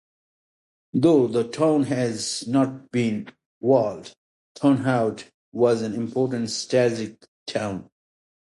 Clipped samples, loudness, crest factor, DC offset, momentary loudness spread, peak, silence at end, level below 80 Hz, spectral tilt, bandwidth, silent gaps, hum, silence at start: under 0.1%; -23 LUFS; 18 dB; under 0.1%; 13 LU; -4 dBFS; 0.65 s; -64 dBFS; -6 dB/octave; 11.5 kHz; 3.46-3.61 s, 4.17-4.55 s, 5.34-5.52 s, 7.28-7.46 s; none; 0.95 s